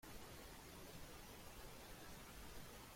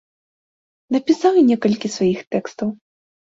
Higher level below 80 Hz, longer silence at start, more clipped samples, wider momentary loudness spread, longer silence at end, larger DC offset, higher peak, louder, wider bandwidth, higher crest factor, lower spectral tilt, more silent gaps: about the same, -64 dBFS vs -60 dBFS; second, 0 s vs 0.9 s; neither; second, 0 LU vs 12 LU; second, 0 s vs 0.55 s; neither; second, -42 dBFS vs -4 dBFS; second, -57 LUFS vs -19 LUFS; first, 16.5 kHz vs 7.8 kHz; about the same, 14 dB vs 16 dB; second, -3.5 dB/octave vs -6 dB/octave; second, none vs 2.27-2.31 s